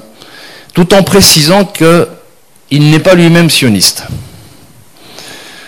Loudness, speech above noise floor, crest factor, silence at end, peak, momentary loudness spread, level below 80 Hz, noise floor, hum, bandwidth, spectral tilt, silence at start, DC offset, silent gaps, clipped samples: -6 LUFS; 37 dB; 8 dB; 0 s; 0 dBFS; 21 LU; -36 dBFS; -43 dBFS; none; over 20 kHz; -4 dB/octave; 0.35 s; under 0.1%; none; 0.7%